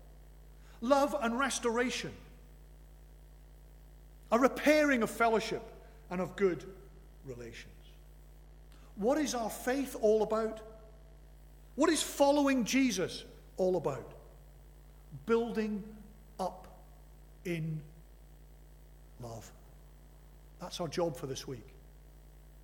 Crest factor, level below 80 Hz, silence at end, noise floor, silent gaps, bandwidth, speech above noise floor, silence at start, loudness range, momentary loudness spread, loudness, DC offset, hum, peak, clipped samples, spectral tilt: 22 dB; -56 dBFS; 0 s; -55 dBFS; none; 18.5 kHz; 23 dB; 0 s; 12 LU; 22 LU; -32 LUFS; under 0.1%; 60 Hz at -65 dBFS; -12 dBFS; under 0.1%; -4.5 dB/octave